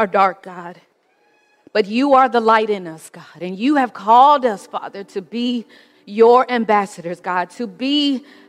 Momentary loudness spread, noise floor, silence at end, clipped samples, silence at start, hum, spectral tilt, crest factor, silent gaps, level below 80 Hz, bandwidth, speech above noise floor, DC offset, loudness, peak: 18 LU; -59 dBFS; 0.3 s; under 0.1%; 0 s; none; -5 dB/octave; 16 dB; none; -66 dBFS; 12 kHz; 42 dB; under 0.1%; -16 LUFS; -2 dBFS